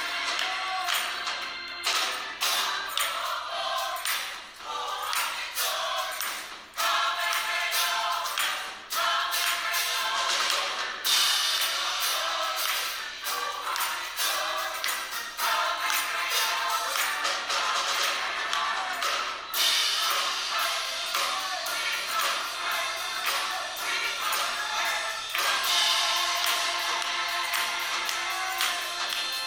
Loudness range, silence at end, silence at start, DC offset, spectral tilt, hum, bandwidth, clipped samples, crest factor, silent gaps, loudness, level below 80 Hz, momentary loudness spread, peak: 3 LU; 0 s; 0 s; under 0.1%; 2.5 dB/octave; none; over 20 kHz; under 0.1%; 20 dB; none; -26 LUFS; -68 dBFS; 7 LU; -8 dBFS